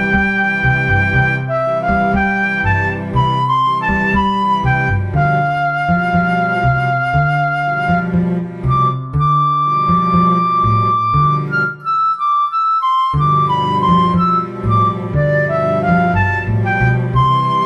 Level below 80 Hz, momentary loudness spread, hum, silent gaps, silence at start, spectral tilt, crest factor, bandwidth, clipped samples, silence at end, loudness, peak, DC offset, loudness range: -32 dBFS; 4 LU; none; none; 0 s; -8 dB/octave; 14 dB; 9.6 kHz; under 0.1%; 0 s; -14 LUFS; 0 dBFS; under 0.1%; 1 LU